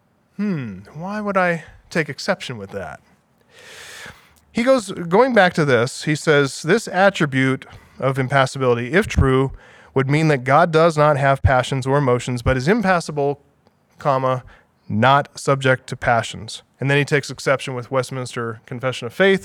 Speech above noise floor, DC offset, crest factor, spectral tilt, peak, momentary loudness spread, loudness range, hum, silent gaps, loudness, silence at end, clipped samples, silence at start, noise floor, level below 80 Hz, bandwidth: 40 dB; under 0.1%; 20 dB; -5.5 dB/octave; 0 dBFS; 13 LU; 7 LU; none; none; -19 LUFS; 0 s; under 0.1%; 0.4 s; -58 dBFS; -40 dBFS; 14 kHz